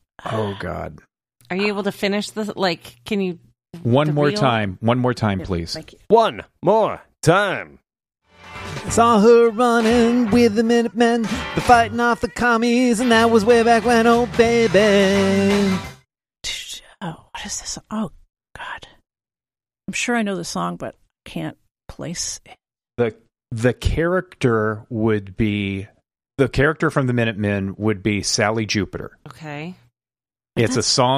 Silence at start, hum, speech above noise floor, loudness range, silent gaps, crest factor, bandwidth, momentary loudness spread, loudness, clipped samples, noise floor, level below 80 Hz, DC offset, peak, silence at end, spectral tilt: 0.25 s; none; over 72 dB; 11 LU; none; 18 dB; 14.5 kHz; 18 LU; -19 LUFS; under 0.1%; under -90 dBFS; -42 dBFS; under 0.1%; 0 dBFS; 0 s; -5 dB/octave